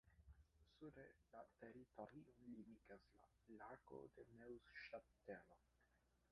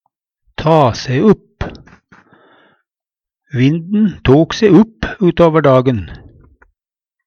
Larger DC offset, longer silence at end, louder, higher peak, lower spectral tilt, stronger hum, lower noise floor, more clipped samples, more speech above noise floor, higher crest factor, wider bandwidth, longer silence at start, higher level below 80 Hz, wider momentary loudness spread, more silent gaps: neither; second, 0 s vs 1.1 s; second, -62 LUFS vs -12 LUFS; second, -42 dBFS vs 0 dBFS; second, -5 dB/octave vs -7.5 dB/octave; neither; second, -82 dBFS vs -88 dBFS; neither; second, 20 dB vs 77 dB; first, 20 dB vs 14 dB; second, 5.8 kHz vs 7 kHz; second, 0.05 s vs 0.6 s; second, -80 dBFS vs -36 dBFS; second, 7 LU vs 17 LU; neither